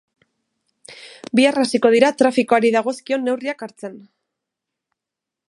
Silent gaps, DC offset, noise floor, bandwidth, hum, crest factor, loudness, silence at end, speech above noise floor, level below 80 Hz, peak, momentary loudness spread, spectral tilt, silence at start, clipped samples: none; under 0.1%; -85 dBFS; 11.5 kHz; none; 20 dB; -17 LUFS; 1.5 s; 68 dB; -70 dBFS; 0 dBFS; 20 LU; -4 dB/octave; 0.9 s; under 0.1%